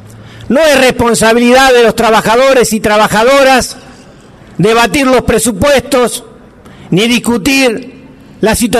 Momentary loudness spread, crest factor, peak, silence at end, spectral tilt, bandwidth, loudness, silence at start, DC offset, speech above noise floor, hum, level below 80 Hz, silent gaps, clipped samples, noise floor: 9 LU; 8 dB; 0 dBFS; 0 s; -3.5 dB/octave; 14 kHz; -8 LUFS; 0.15 s; under 0.1%; 28 dB; none; -34 dBFS; none; under 0.1%; -35 dBFS